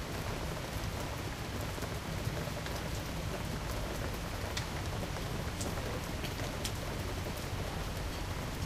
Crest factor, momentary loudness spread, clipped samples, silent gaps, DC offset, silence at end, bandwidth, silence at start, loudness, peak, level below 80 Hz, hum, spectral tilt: 20 dB; 2 LU; under 0.1%; none; under 0.1%; 0 s; 15.5 kHz; 0 s; -38 LUFS; -18 dBFS; -44 dBFS; none; -4.5 dB/octave